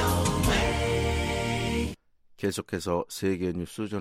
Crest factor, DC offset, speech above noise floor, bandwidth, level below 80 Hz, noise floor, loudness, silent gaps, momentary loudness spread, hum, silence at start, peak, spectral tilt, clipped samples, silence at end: 16 dB; under 0.1%; 23 dB; 16 kHz; -38 dBFS; -53 dBFS; -28 LUFS; none; 9 LU; none; 0 s; -12 dBFS; -5 dB/octave; under 0.1%; 0 s